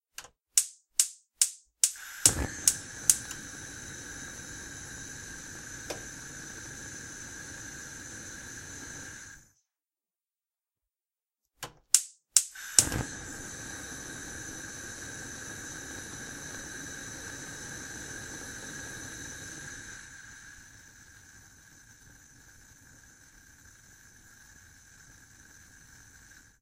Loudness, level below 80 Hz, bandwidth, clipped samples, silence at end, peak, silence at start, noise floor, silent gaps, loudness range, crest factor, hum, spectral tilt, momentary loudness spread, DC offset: -32 LUFS; -56 dBFS; 16 kHz; under 0.1%; 0.1 s; 0 dBFS; 0.2 s; under -90 dBFS; none; 26 LU; 36 dB; none; -0.5 dB/octave; 25 LU; under 0.1%